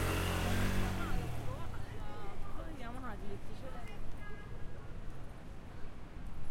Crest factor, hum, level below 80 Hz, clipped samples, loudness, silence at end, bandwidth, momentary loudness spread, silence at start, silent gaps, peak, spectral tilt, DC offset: 16 dB; none; -44 dBFS; under 0.1%; -42 LUFS; 0 s; 16.5 kHz; 16 LU; 0 s; none; -20 dBFS; -5.5 dB/octave; under 0.1%